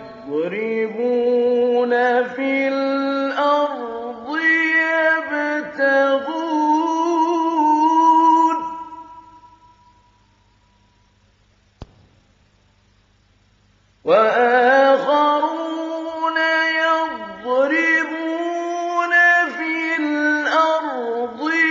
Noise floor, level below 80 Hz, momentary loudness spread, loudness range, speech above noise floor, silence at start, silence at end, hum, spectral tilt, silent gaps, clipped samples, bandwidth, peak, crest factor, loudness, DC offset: -58 dBFS; -62 dBFS; 11 LU; 3 LU; 38 dB; 0 s; 0 s; none; -1 dB/octave; none; under 0.1%; 7.6 kHz; -2 dBFS; 16 dB; -18 LUFS; under 0.1%